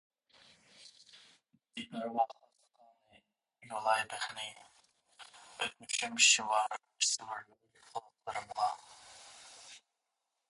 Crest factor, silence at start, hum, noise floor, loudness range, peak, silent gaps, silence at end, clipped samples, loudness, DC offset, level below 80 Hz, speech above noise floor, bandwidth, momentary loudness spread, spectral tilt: 26 dB; 0.8 s; none; -86 dBFS; 11 LU; -12 dBFS; none; 0.7 s; under 0.1%; -33 LUFS; under 0.1%; -84 dBFS; 51 dB; 11.5 kHz; 26 LU; 0.5 dB/octave